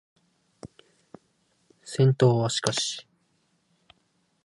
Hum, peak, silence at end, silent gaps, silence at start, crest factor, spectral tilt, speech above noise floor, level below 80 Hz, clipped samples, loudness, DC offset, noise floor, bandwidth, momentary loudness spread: none; -6 dBFS; 1.45 s; none; 0.65 s; 24 dB; -5 dB/octave; 48 dB; -68 dBFS; under 0.1%; -24 LUFS; under 0.1%; -70 dBFS; 11.5 kHz; 28 LU